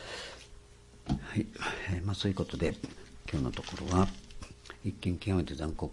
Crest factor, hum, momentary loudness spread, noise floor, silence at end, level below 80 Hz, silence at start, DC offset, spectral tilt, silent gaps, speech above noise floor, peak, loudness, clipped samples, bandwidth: 24 dB; none; 17 LU; -55 dBFS; 0 s; -48 dBFS; 0 s; under 0.1%; -6 dB/octave; none; 22 dB; -10 dBFS; -35 LUFS; under 0.1%; 11.5 kHz